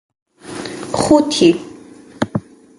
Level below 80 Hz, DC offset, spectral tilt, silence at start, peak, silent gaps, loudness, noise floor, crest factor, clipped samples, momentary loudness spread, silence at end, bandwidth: -48 dBFS; under 0.1%; -5 dB/octave; 0.45 s; 0 dBFS; none; -16 LUFS; -39 dBFS; 18 dB; under 0.1%; 17 LU; 0.4 s; 11.5 kHz